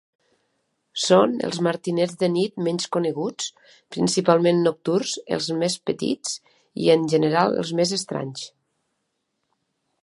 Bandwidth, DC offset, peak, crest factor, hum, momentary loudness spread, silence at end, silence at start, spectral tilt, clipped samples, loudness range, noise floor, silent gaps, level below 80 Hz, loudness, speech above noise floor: 11.5 kHz; under 0.1%; -2 dBFS; 22 dB; none; 13 LU; 1.55 s; 0.95 s; -4.5 dB/octave; under 0.1%; 2 LU; -76 dBFS; none; -68 dBFS; -22 LUFS; 54 dB